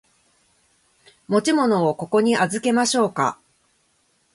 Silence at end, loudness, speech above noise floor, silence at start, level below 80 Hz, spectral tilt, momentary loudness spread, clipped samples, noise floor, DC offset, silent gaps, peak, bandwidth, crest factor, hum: 1 s; -20 LUFS; 45 dB; 1.3 s; -66 dBFS; -4.5 dB/octave; 5 LU; under 0.1%; -65 dBFS; under 0.1%; none; -6 dBFS; 11.5 kHz; 16 dB; none